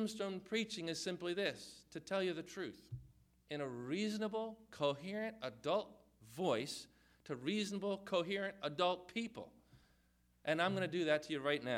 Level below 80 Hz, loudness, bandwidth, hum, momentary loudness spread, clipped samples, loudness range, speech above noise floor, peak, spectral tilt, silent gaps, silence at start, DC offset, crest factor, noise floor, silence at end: -74 dBFS; -41 LUFS; 16 kHz; none; 14 LU; under 0.1%; 3 LU; 34 dB; -22 dBFS; -4.5 dB/octave; none; 0 s; under 0.1%; 20 dB; -74 dBFS; 0 s